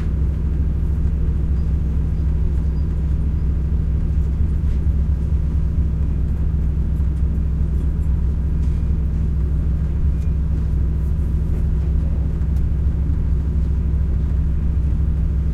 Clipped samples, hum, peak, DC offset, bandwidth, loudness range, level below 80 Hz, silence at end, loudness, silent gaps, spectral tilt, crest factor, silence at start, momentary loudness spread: under 0.1%; none; -6 dBFS; under 0.1%; 2.9 kHz; 0 LU; -20 dBFS; 0 s; -21 LUFS; none; -10 dB/octave; 12 dB; 0 s; 1 LU